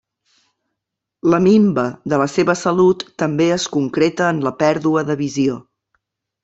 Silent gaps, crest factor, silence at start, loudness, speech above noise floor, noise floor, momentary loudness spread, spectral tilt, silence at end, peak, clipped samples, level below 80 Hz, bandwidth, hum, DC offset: none; 16 dB; 1.25 s; -17 LUFS; 65 dB; -81 dBFS; 8 LU; -6 dB/octave; 0.8 s; -2 dBFS; under 0.1%; -56 dBFS; 8 kHz; none; under 0.1%